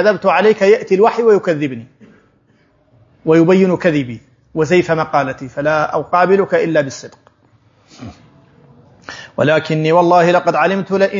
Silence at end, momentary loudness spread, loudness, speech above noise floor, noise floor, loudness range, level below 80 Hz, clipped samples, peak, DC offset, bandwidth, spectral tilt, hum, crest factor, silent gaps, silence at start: 0 s; 16 LU; -14 LUFS; 42 dB; -55 dBFS; 5 LU; -56 dBFS; under 0.1%; 0 dBFS; under 0.1%; 7.6 kHz; -6.5 dB/octave; none; 14 dB; none; 0 s